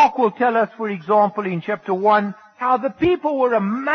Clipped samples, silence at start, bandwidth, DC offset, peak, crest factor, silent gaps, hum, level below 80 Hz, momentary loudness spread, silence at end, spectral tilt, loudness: under 0.1%; 0 s; 6.4 kHz; under 0.1%; -4 dBFS; 14 dB; none; none; -54 dBFS; 8 LU; 0 s; -7.5 dB/octave; -19 LUFS